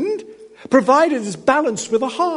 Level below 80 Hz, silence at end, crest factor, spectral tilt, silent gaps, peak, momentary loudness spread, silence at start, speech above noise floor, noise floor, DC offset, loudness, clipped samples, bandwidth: -62 dBFS; 0 s; 18 dB; -4 dB/octave; none; 0 dBFS; 8 LU; 0 s; 22 dB; -38 dBFS; under 0.1%; -17 LUFS; under 0.1%; 11 kHz